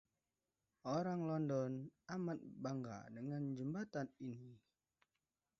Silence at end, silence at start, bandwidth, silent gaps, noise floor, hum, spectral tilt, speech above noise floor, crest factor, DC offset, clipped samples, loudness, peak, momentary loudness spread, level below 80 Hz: 1 s; 0.85 s; 7.4 kHz; none; under -90 dBFS; none; -7.5 dB/octave; over 46 dB; 18 dB; under 0.1%; under 0.1%; -45 LUFS; -28 dBFS; 11 LU; -82 dBFS